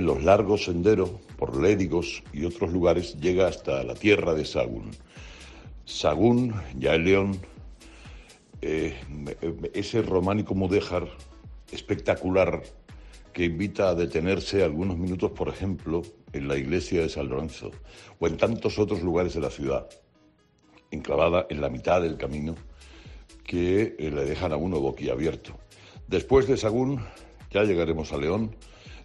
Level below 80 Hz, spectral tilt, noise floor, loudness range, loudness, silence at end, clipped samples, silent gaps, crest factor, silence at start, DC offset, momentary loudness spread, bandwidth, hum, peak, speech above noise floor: -46 dBFS; -6.5 dB/octave; -61 dBFS; 4 LU; -26 LUFS; 0 s; under 0.1%; none; 20 dB; 0 s; under 0.1%; 18 LU; 11 kHz; none; -6 dBFS; 36 dB